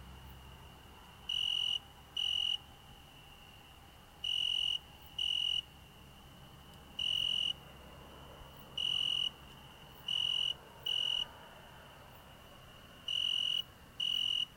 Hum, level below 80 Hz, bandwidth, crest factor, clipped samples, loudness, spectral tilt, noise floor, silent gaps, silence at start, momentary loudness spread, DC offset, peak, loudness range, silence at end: none; -62 dBFS; 16.5 kHz; 14 dB; under 0.1%; -34 LUFS; -1 dB/octave; -57 dBFS; none; 0 s; 24 LU; under 0.1%; -24 dBFS; 2 LU; 0 s